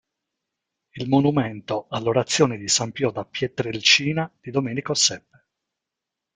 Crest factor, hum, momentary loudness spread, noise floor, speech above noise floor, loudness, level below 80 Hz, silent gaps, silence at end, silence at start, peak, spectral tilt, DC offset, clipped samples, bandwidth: 22 dB; none; 11 LU; -85 dBFS; 63 dB; -21 LUFS; -60 dBFS; none; 1.15 s; 0.95 s; -2 dBFS; -3.5 dB/octave; under 0.1%; under 0.1%; 9.8 kHz